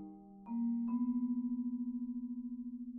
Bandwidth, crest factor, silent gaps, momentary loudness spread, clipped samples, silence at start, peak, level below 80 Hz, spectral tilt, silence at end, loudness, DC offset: 2.6 kHz; 10 dB; none; 9 LU; under 0.1%; 0 s; -28 dBFS; -72 dBFS; -10 dB/octave; 0 s; -39 LUFS; under 0.1%